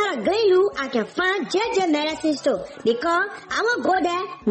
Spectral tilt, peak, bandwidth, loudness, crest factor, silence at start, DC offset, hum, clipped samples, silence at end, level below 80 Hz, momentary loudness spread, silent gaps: -4 dB/octave; -10 dBFS; 8.8 kHz; -22 LUFS; 12 dB; 0 s; under 0.1%; none; under 0.1%; 0 s; -58 dBFS; 6 LU; none